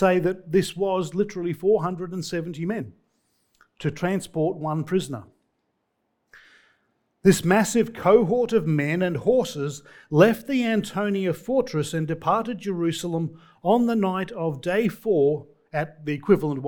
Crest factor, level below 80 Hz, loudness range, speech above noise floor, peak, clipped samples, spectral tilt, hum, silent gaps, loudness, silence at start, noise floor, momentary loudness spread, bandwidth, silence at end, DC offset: 20 dB; -58 dBFS; 8 LU; 52 dB; -4 dBFS; under 0.1%; -6 dB/octave; none; none; -24 LUFS; 0 s; -74 dBFS; 11 LU; 19 kHz; 0 s; under 0.1%